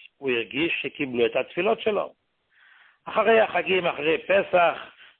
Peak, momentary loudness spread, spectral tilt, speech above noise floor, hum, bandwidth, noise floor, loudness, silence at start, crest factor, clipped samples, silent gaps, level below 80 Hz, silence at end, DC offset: -8 dBFS; 9 LU; -9 dB/octave; 37 dB; none; 4.3 kHz; -60 dBFS; -23 LUFS; 0.2 s; 16 dB; under 0.1%; none; -64 dBFS; 0.3 s; under 0.1%